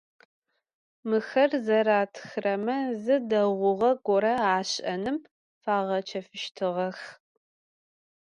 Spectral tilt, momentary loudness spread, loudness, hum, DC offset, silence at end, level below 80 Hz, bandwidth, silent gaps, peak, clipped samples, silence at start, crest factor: -5 dB/octave; 12 LU; -27 LUFS; none; under 0.1%; 1.15 s; -72 dBFS; 10.5 kHz; 5.31-5.61 s; -10 dBFS; under 0.1%; 1.05 s; 18 dB